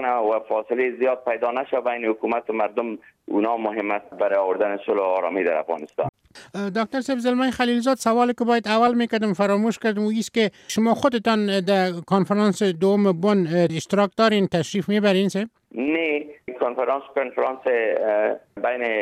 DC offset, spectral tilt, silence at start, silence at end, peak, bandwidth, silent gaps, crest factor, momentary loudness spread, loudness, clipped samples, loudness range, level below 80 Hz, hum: under 0.1%; -5.5 dB/octave; 0 s; 0 s; -6 dBFS; 14.5 kHz; 6.09-6.13 s; 16 dB; 8 LU; -22 LUFS; under 0.1%; 4 LU; -64 dBFS; none